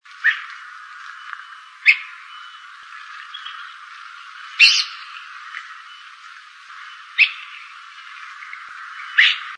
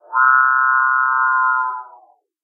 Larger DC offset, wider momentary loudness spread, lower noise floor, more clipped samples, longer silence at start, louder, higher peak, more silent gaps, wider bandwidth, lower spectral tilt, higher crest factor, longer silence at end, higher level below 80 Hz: neither; first, 24 LU vs 9 LU; second, -42 dBFS vs -50 dBFS; neither; about the same, 0.2 s vs 0.1 s; about the same, -15 LUFS vs -15 LUFS; about the same, 0 dBFS vs -2 dBFS; neither; first, 10.5 kHz vs 1.9 kHz; second, 8.5 dB/octave vs -2.5 dB/octave; first, 24 dB vs 14 dB; second, 0 s vs 0.6 s; about the same, under -90 dBFS vs under -90 dBFS